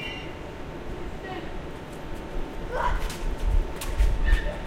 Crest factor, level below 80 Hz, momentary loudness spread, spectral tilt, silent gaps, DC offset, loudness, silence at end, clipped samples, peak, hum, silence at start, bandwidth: 18 dB; -28 dBFS; 11 LU; -5.5 dB/octave; none; under 0.1%; -32 LUFS; 0 s; under 0.1%; -8 dBFS; none; 0 s; 15 kHz